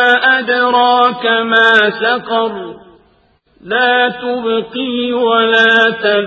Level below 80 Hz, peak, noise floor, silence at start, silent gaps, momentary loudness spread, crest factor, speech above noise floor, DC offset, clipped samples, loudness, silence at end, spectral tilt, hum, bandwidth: -58 dBFS; 0 dBFS; -54 dBFS; 0 s; none; 10 LU; 12 dB; 41 dB; under 0.1%; under 0.1%; -12 LUFS; 0 s; -4.5 dB/octave; none; 8 kHz